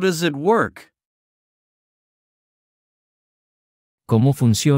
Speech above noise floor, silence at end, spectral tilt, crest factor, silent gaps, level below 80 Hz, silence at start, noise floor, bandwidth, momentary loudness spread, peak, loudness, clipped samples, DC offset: over 73 dB; 0 s; -6 dB/octave; 18 dB; 1.05-3.98 s; -60 dBFS; 0 s; under -90 dBFS; 16 kHz; 5 LU; -4 dBFS; -19 LUFS; under 0.1%; under 0.1%